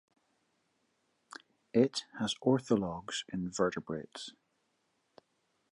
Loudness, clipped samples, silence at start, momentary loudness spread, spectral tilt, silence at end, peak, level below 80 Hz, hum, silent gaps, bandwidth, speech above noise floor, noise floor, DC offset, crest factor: -33 LUFS; under 0.1%; 1.75 s; 21 LU; -5 dB/octave; 1.4 s; -14 dBFS; -68 dBFS; none; none; 11.5 kHz; 45 dB; -78 dBFS; under 0.1%; 22 dB